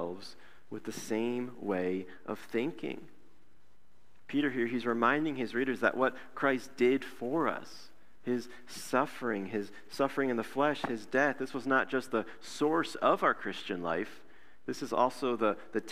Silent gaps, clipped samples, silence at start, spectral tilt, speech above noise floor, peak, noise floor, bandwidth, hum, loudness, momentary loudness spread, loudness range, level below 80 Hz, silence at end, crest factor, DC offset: none; under 0.1%; 0 s; -5 dB/octave; 36 dB; -12 dBFS; -69 dBFS; 15.5 kHz; none; -33 LUFS; 13 LU; 6 LU; -72 dBFS; 0 s; 22 dB; 0.5%